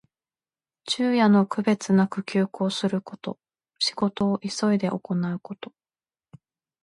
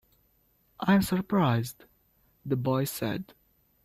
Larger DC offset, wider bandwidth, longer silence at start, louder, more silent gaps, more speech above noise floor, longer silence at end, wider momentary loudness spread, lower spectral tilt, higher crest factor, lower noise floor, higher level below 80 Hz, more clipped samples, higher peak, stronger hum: neither; second, 11 kHz vs 16 kHz; about the same, 0.85 s vs 0.8 s; first, -24 LUFS vs -28 LUFS; neither; first, over 66 dB vs 41 dB; first, 1.2 s vs 0.6 s; first, 17 LU vs 14 LU; about the same, -5.5 dB/octave vs -6.5 dB/octave; about the same, 16 dB vs 18 dB; first, under -90 dBFS vs -68 dBFS; second, -68 dBFS vs -58 dBFS; neither; first, -8 dBFS vs -12 dBFS; neither